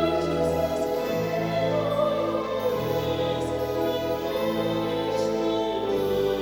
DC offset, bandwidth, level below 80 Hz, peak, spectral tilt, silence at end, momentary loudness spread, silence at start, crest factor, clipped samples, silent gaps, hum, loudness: under 0.1%; over 20 kHz; -48 dBFS; -12 dBFS; -6 dB/octave; 0 s; 2 LU; 0 s; 14 dB; under 0.1%; none; none; -26 LUFS